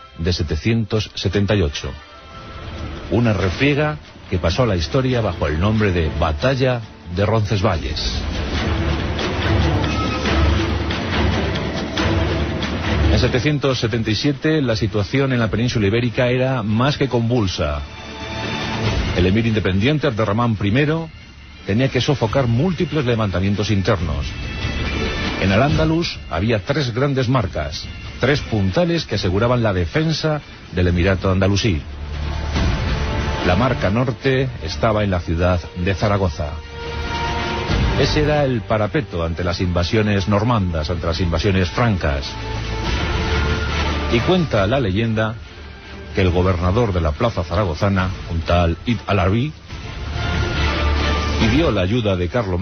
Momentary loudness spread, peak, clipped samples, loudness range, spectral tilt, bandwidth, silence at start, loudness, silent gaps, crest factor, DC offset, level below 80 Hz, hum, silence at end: 8 LU; -4 dBFS; under 0.1%; 2 LU; -6.5 dB/octave; 6.6 kHz; 0 s; -19 LUFS; none; 14 dB; under 0.1%; -30 dBFS; none; 0 s